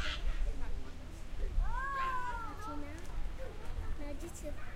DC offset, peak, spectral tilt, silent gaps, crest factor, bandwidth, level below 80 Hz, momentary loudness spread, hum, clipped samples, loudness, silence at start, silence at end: under 0.1%; -20 dBFS; -4.5 dB/octave; none; 14 dB; 12.5 kHz; -38 dBFS; 11 LU; none; under 0.1%; -42 LUFS; 0 s; 0 s